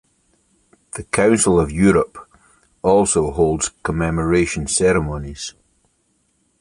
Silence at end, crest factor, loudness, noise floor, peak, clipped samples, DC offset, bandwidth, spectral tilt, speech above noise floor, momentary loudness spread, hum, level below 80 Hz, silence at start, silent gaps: 1.1 s; 18 dB; -17 LUFS; -65 dBFS; -2 dBFS; under 0.1%; under 0.1%; 11.5 kHz; -5 dB/octave; 47 dB; 14 LU; none; -36 dBFS; 0.95 s; none